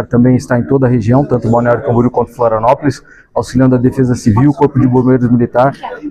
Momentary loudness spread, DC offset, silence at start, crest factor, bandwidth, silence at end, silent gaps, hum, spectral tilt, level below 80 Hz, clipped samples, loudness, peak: 5 LU; under 0.1%; 0 s; 10 dB; 10 kHz; 0 s; none; none; -8.5 dB/octave; -36 dBFS; under 0.1%; -11 LUFS; 0 dBFS